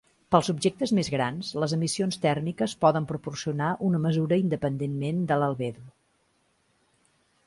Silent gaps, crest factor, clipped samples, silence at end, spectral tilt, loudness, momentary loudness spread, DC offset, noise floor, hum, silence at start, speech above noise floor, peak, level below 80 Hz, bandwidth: none; 22 dB; under 0.1%; 1.55 s; -6 dB/octave; -27 LUFS; 7 LU; under 0.1%; -69 dBFS; none; 0.3 s; 43 dB; -4 dBFS; -62 dBFS; 11.5 kHz